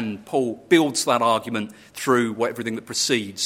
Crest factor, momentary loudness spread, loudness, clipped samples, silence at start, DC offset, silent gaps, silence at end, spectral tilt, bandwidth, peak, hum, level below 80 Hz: 18 dB; 11 LU; -22 LUFS; under 0.1%; 0 s; under 0.1%; none; 0 s; -3.5 dB/octave; 16.5 kHz; -4 dBFS; none; -68 dBFS